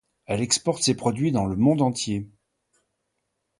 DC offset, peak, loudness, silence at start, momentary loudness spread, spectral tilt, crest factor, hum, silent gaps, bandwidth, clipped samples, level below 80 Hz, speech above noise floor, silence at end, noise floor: under 0.1%; -6 dBFS; -23 LUFS; 0.3 s; 10 LU; -4.5 dB/octave; 18 dB; none; none; 11.5 kHz; under 0.1%; -52 dBFS; 55 dB; 1.35 s; -78 dBFS